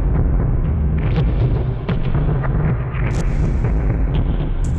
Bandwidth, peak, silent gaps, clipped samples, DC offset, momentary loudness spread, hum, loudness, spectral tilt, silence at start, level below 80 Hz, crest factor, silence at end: 8.4 kHz; -10 dBFS; none; under 0.1%; under 0.1%; 3 LU; none; -20 LUFS; -8.5 dB/octave; 0 s; -20 dBFS; 8 dB; 0 s